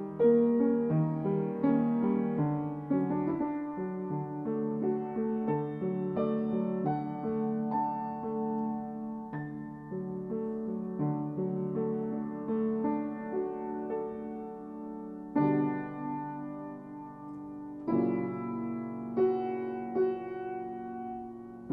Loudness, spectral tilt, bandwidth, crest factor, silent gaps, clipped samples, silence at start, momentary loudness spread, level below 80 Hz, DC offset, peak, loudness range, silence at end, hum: -33 LUFS; -11.5 dB/octave; 3.9 kHz; 18 dB; none; under 0.1%; 0 s; 13 LU; -68 dBFS; under 0.1%; -14 dBFS; 5 LU; 0 s; none